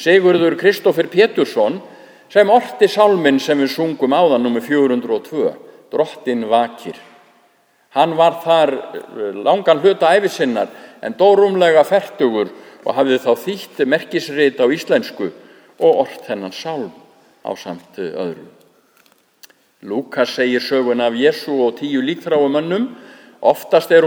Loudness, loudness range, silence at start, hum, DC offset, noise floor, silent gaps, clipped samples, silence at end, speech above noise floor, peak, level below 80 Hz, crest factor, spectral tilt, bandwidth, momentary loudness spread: -16 LUFS; 7 LU; 0 s; none; under 0.1%; -56 dBFS; none; under 0.1%; 0 s; 41 dB; 0 dBFS; -72 dBFS; 16 dB; -5 dB/octave; over 20 kHz; 14 LU